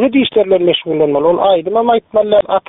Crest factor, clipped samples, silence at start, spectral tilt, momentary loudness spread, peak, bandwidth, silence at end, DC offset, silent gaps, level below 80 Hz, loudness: 10 dB; under 0.1%; 0 s; -3.5 dB/octave; 2 LU; -2 dBFS; 4 kHz; 0.1 s; under 0.1%; none; -50 dBFS; -12 LUFS